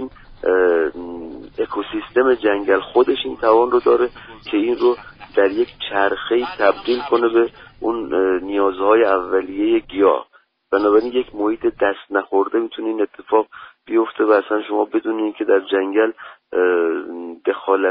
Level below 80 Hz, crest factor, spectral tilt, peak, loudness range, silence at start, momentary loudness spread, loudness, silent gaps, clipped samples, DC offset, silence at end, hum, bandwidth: -52 dBFS; 16 dB; -2 dB/octave; -2 dBFS; 2 LU; 0 s; 9 LU; -18 LUFS; none; under 0.1%; under 0.1%; 0 s; none; 5.2 kHz